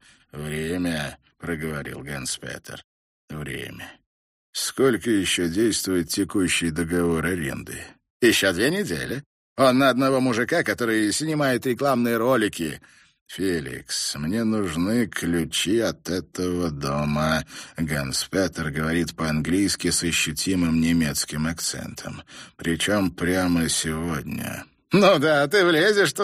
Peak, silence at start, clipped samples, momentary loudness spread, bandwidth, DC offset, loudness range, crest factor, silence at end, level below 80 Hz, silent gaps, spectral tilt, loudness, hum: -4 dBFS; 0.35 s; under 0.1%; 16 LU; 15.5 kHz; under 0.1%; 6 LU; 20 dB; 0 s; -48 dBFS; 2.84-3.28 s, 4.06-4.53 s, 8.10-8.20 s, 9.26-9.56 s, 13.21-13.26 s; -4 dB/octave; -23 LUFS; none